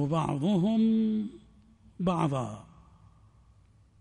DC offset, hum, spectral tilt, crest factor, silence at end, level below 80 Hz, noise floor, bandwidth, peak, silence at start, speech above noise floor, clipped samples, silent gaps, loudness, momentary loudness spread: under 0.1%; none; -8 dB/octave; 14 dB; 1.4 s; -60 dBFS; -60 dBFS; 10.5 kHz; -16 dBFS; 0 s; 33 dB; under 0.1%; none; -29 LUFS; 14 LU